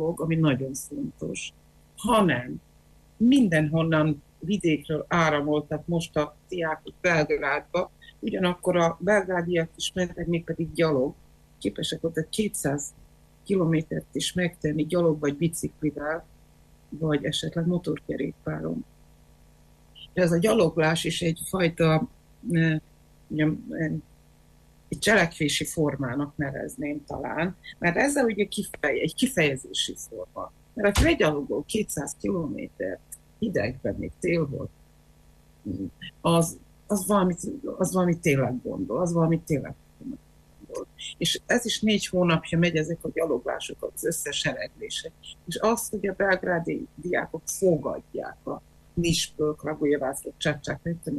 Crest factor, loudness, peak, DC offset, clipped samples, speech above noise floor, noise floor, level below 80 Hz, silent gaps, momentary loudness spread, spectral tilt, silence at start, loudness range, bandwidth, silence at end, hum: 16 dB; -26 LUFS; -10 dBFS; under 0.1%; under 0.1%; 30 dB; -56 dBFS; -48 dBFS; none; 13 LU; -5 dB/octave; 0 s; 5 LU; 13.5 kHz; 0 s; none